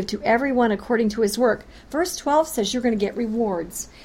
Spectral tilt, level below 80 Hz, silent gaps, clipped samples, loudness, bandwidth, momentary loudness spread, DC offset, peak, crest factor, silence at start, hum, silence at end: -4 dB/octave; -48 dBFS; none; under 0.1%; -22 LUFS; 16.5 kHz; 7 LU; under 0.1%; -8 dBFS; 14 dB; 0 s; none; 0 s